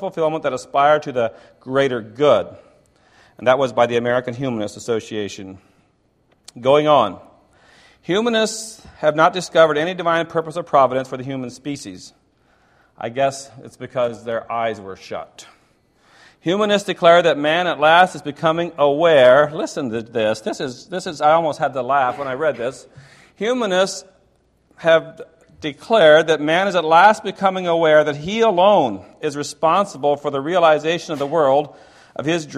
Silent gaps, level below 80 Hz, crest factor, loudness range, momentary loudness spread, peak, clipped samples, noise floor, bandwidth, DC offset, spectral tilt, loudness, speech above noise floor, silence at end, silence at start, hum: none; -60 dBFS; 18 dB; 9 LU; 16 LU; 0 dBFS; under 0.1%; -61 dBFS; 12.5 kHz; under 0.1%; -4.5 dB/octave; -18 LUFS; 43 dB; 0 s; 0 s; none